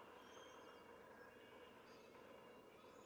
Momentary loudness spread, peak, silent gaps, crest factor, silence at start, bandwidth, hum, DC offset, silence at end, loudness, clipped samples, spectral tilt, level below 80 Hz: 3 LU; -48 dBFS; none; 14 dB; 0 s; over 20 kHz; none; under 0.1%; 0 s; -62 LUFS; under 0.1%; -3.5 dB/octave; -88 dBFS